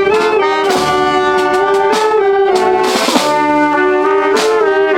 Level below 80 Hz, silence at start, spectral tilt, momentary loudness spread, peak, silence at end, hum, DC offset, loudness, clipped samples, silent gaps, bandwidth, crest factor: -46 dBFS; 0 s; -3.5 dB/octave; 1 LU; 0 dBFS; 0 s; none; under 0.1%; -11 LUFS; under 0.1%; none; 16.5 kHz; 12 dB